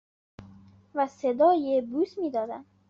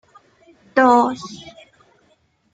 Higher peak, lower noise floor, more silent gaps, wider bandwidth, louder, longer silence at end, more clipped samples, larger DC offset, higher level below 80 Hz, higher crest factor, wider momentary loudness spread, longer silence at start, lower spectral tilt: second, -12 dBFS vs -2 dBFS; second, -53 dBFS vs -61 dBFS; neither; second, 7.4 kHz vs 9.2 kHz; second, -27 LUFS vs -16 LUFS; second, 0.3 s vs 1.15 s; neither; neither; about the same, -70 dBFS vs -66 dBFS; about the same, 16 dB vs 20 dB; second, 11 LU vs 22 LU; second, 0.4 s vs 0.75 s; about the same, -5 dB/octave vs -4.5 dB/octave